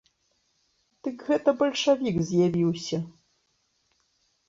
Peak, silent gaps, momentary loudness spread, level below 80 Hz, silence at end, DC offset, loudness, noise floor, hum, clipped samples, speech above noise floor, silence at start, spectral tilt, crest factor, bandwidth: -8 dBFS; none; 13 LU; -62 dBFS; 1.4 s; under 0.1%; -26 LUFS; -72 dBFS; none; under 0.1%; 47 dB; 1.05 s; -6 dB/octave; 20 dB; 7.8 kHz